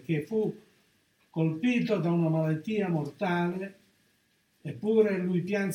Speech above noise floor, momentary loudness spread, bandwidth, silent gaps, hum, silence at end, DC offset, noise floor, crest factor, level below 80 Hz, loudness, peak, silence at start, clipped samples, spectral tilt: 42 dB; 12 LU; 10.5 kHz; none; none; 0 s; under 0.1%; -70 dBFS; 16 dB; -74 dBFS; -29 LUFS; -12 dBFS; 0.1 s; under 0.1%; -8 dB/octave